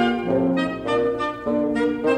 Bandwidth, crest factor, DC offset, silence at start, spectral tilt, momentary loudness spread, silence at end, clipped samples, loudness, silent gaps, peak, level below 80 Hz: 10 kHz; 16 dB; under 0.1%; 0 s; -7 dB/octave; 3 LU; 0 s; under 0.1%; -22 LUFS; none; -6 dBFS; -50 dBFS